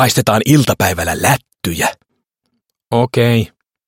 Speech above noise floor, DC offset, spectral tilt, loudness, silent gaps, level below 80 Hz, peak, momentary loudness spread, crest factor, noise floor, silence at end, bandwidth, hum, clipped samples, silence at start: 56 dB; under 0.1%; -5 dB/octave; -14 LUFS; none; -42 dBFS; 0 dBFS; 8 LU; 16 dB; -70 dBFS; 0.4 s; 17 kHz; none; under 0.1%; 0 s